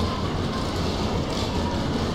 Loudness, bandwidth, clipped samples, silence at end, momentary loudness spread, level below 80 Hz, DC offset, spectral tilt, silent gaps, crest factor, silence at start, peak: -26 LUFS; 15.5 kHz; under 0.1%; 0 s; 1 LU; -36 dBFS; under 0.1%; -5.5 dB/octave; none; 12 dB; 0 s; -12 dBFS